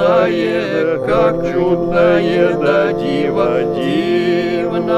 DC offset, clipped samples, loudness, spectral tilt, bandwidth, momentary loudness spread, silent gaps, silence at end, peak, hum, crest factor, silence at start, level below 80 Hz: under 0.1%; under 0.1%; -15 LUFS; -7 dB/octave; 9.4 kHz; 4 LU; none; 0 s; -2 dBFS; none; 12 dB; 0 s; -40 dBFS